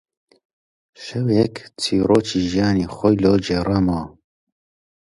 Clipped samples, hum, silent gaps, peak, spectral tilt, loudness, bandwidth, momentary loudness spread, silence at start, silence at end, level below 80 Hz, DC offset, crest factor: under 0.1%; none; none; -2 dBFS; -6.5 dB/octave; -19 LUFS; 11.5 kHz; 10 LU; 1 s; 0.95 s; -42 dBFS; under 0.1%; 18 dB